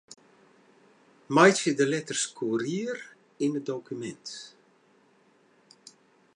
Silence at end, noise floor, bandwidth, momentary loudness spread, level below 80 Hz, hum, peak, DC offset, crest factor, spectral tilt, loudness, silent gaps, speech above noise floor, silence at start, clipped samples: 1.85 s; -63 dBFS; 11 kHz; 20 LU; -80 dBFS; none; -6 dBFS; under 0.1%; 24 dB; -4 dB/octave; -27 LUFS; none; 37 dB; 1.3 s; under 0.1%